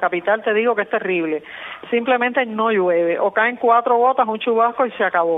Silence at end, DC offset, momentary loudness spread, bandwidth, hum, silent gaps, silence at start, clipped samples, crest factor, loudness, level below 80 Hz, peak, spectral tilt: 0 s; under 0.1%; 6 LU; 3.9 kHz; none; none; 0 s; under 0.1%; 16 dB; -18 LUFS; -70 dBFS; -2 dBFS; -8 dB/octave